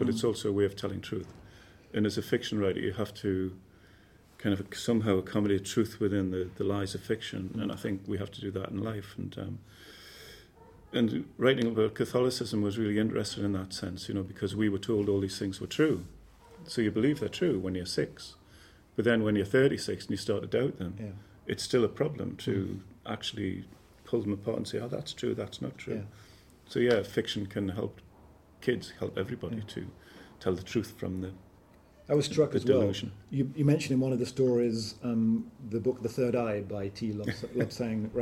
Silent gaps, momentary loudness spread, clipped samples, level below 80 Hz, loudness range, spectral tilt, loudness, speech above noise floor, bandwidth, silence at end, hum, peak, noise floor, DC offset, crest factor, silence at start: none; 12 LU; under 0.1%; -60 dBFS; 6 LU; -6 dB/octave; -31 LUFS; 28 dB; 16.5 kHz; 0 s; none; -10 dBFS; -58 dBFS; under 0.1%; 22 dB; 0 s